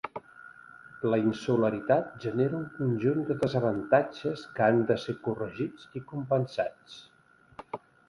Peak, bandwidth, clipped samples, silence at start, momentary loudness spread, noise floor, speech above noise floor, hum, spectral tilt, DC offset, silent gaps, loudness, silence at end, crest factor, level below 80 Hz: -10 dBFS; 11.5 kHz; under 0.1%; 0.05 s; 19 LU; -51 dBFS; 23 dB; none; -8 dB/octave; under 0.1%; none; -29 LUFS; 0.3 s; 20 dB; -66 dBFS